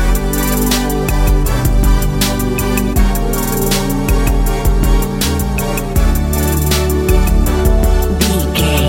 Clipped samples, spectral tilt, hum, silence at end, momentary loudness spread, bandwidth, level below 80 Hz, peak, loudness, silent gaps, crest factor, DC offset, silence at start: under 0.1%; -5 dB/octave; none; 0 s; 2 LU; 16.5 kHz; -14 dBFS; 0 dBFS; -15 LUFS; none; 12 dB; under 0.1%; 0 s